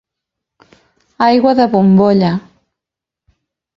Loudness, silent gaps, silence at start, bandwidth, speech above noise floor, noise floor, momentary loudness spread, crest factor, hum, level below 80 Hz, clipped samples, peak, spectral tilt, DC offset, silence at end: -12 LUFS; none; 1.2 s; 6 kHz; 74 dB; -85 dBFS; 7 LU; 14 dB; none; -52 dBFS; under 0.1%; 0 dBFS; -9 dB/octave; under 0.1%; 1.4 s